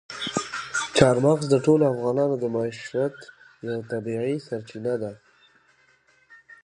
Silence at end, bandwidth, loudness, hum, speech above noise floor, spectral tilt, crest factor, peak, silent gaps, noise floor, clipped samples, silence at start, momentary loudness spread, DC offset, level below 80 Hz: 0.1 s; 11 kHz; -24 LUFS; none; 38 dB; -5.5 dB/octave; 24 dB; 0 dBFS; none; -61 dBFS; under 0.1%; 0.1 s; 13 LU; under 0.1%; -56 dBFS